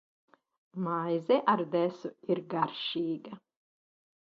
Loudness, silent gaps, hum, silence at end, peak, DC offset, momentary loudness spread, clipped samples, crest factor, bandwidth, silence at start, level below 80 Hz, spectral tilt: -31 LUFS; none; none; 0.85 s; -12 dBFS; under 0.1%; 15 LU; under 0.1%; 20 dB; 6.8 kHz; 0.75 s; -82 dBFS; -7.5 dB/octave